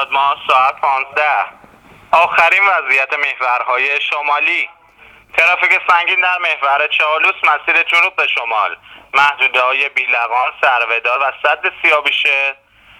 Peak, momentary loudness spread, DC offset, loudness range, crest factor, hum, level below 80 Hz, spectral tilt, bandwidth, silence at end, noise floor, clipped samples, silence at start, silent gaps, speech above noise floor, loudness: 0 dBFS; 6 LU; under 0.1%; 2 LU; 14 dB; none; -60 dBFS; -1 dB/octave; 15.5 kHz; 0.45 s; -44 dBFS; under 0.1%; 0 s; none; 30 dB; -13 LUFS